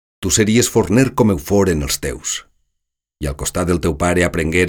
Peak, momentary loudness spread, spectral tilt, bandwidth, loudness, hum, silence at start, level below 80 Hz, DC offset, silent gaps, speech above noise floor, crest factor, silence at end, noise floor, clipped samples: -4 dBFS; 9 LU; -4.5 dB/octave; 20 kHz; -17 LUFS; none; 0.2 s; -32 dBFS; under 0.1%; none; 59 dB; 14 dB; 0 s; -75 dBFS; under 0.1%